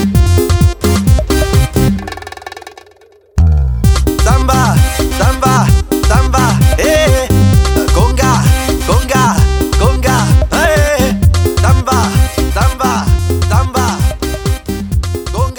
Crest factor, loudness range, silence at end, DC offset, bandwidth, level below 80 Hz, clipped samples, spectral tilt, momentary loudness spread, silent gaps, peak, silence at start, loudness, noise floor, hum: 10 dB; 3 LU; 0 s; under 0.1%; over 20 kHz; -16 dBFS; under 0.1%; -5.5 dB/octave; 7 LU; none; 0 dBFS; 0 s; -11 LUFS; -44 dBFS; none